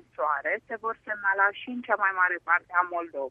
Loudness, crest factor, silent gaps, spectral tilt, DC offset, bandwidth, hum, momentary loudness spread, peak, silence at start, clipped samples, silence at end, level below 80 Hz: -27 LUFS; 20 dB; none; -5.5 dB/octave; under 0.1%; 3.8 kHz; none; 9 LU; -8 dBFS; 0.2 s; under 0.1%; 0 s; -74 dBFS